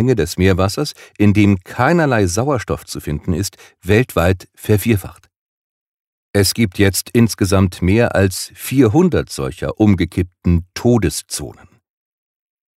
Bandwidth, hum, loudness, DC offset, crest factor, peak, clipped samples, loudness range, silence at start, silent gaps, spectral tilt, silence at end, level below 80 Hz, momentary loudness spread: 16 kHz; none; -16 LUFS; under 0.1%; 16 dB; 0 dBFS; under 0.1%; 4 LU; 0 s; 5.36-6.34 s; -6 dB/octave; 1.25 s; -38 dBFS; 10 LU